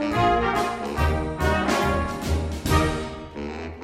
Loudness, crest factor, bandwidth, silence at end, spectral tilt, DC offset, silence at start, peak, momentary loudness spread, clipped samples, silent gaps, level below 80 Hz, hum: -24 LUFS; 16 dB; 15.5 kHz; 0 s; -5.5 dB/octave; under 0.1%; 0 s; -6 dBFS; 12 LU; under 0.1%; none; -32 dBFS; none